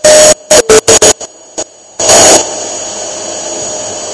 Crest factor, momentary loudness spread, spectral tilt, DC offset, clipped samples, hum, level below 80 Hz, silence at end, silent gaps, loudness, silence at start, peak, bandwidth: 8 dB; 18 LU; -1 dB/octave; under 0.1%; 7%; none; -38 dBFS; 0 s; none; -6 LUFS; 0 s; 0 dBFS; 11 kHz